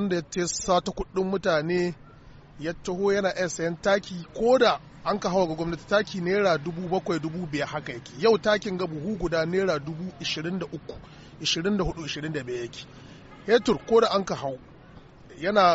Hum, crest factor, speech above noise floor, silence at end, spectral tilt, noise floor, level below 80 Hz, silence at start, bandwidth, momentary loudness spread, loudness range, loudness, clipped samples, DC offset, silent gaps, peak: none; 18 dB; 23 dB; 0 s; -4 dB/octave; -49 dBFS; -50 dBFS; 0 s; 8 kHz; 13 LU; 4 LU; -26 LUFS; under 0.1%; under 0.1%; none; -8 dBFS